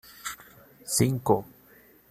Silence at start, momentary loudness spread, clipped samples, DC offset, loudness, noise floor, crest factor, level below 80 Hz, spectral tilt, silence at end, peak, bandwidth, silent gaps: 0.25 s; 19 LU; under 0.1%; under 0.1%; -27 LUFS; -56 dBFS; 22 dB; -60 dBFS; -5 dB/octave; 0.65 s; -8 dBFS; 15 kHz; none